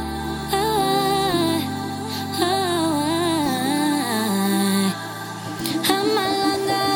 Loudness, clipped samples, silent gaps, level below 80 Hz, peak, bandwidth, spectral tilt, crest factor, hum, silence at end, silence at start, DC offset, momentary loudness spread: -21 LUFS; under 0.1%; none; -46 dBFS; -2 dBFS; 19 kHz; -4 dB/octave; 20 dB; none; 0 s; 0 s; under 0.1%; 8 LU